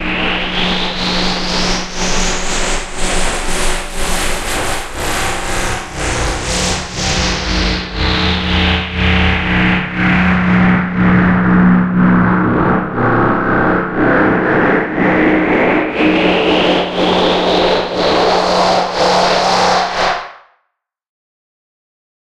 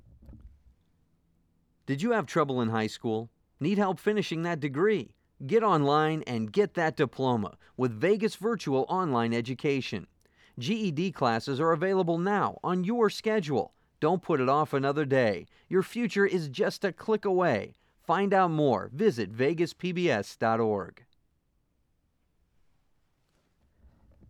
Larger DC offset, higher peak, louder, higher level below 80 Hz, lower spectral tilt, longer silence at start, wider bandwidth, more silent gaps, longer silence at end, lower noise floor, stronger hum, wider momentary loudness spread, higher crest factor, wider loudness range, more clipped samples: neither; first, 0 dBFS vs -12 dBFS; first, -13 LUFS vs -28 LUFS; first, -24 dBFS vs -66 dBFS; second, -4.5 dB/octave vs -6.5 dB/octave; second, 0 s vs 0.3 s; about the same, 13.5 kHz vs 13 kHz; neither; second, 1.85 s vs 3.4 s; about the same, -70 dBFS vs -73 dBFS; neither; about the same, 6 LU vs 7 LU; about the same, 14 dB vs 18 dB; about the same, 6 LU vs 4 LU; neither